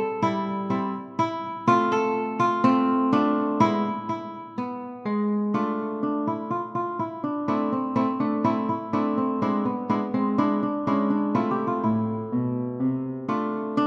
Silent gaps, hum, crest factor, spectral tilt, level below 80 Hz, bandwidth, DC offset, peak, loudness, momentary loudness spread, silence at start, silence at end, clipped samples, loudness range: none; none; 18 dB; -8 dB/octave; -68 dBFS; 7.4 kHz; under 0.1%; -6 dBFS; -25 LUFS; 8 LU; 0 s; 0 s; under 0.1%; 4 LU